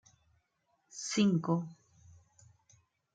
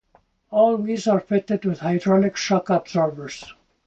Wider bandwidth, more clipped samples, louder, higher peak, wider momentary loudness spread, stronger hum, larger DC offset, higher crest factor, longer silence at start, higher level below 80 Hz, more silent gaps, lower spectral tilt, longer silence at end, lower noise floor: first, 9.2 kHz vs 8 kHz; neither; second, -32 LUFS vs -21 LUFS; second, -16 dBFS vs -6 dBFS; first, 19 LU vs 7 LU; neither; neither; first, 20 dB vs 14 dB; first, 0.95 s vs 0.5 s; second, -76 dBFS vs -60 dBFS; neither; about the same, -5.5 dB/octave vs -6 dB/octave; first, 1.4 s vs 0.35 s; first, -78 dBFS vs -61 dBFS